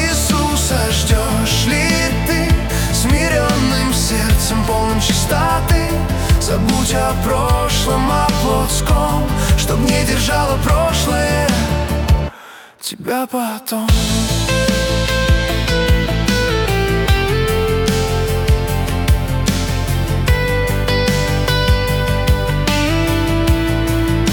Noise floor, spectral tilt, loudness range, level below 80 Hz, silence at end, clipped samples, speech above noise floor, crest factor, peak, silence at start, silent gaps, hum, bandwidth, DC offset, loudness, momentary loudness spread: -38 dBFS; -4.5 dB/octave; 2 LU; -20 dBFS; 0 s; under 0.1%; 22 dB; 14 dB; -2 dBFS; 0 s; none; none; 18 kHz; under 0.1%; -16 LUFS; 3 LU